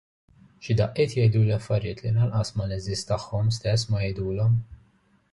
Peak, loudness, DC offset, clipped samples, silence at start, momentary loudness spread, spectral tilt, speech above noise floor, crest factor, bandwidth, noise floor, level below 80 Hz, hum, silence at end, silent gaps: -10 dBFS; -25 LUFS; under 0.1%; under 0.1%; 0.6 s; 8 LU; -6.5 dB/octave; 39 dB; 16 dB; 11.5 kHz; -63 dBFS; -46 dBFS; none; 0.55 s; none